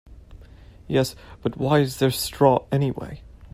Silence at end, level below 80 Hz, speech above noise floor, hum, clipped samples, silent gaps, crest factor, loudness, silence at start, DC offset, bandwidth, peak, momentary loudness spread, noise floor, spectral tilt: 0.05 s; -46 dBFS; 24 dB; none; under 0.1%; none; 18 dB; -22 LUFS; 0.1 s; under 0.1%; 16 kHz; -4 dBFS; 14 LU; -46 dBFS; -6 dB/octave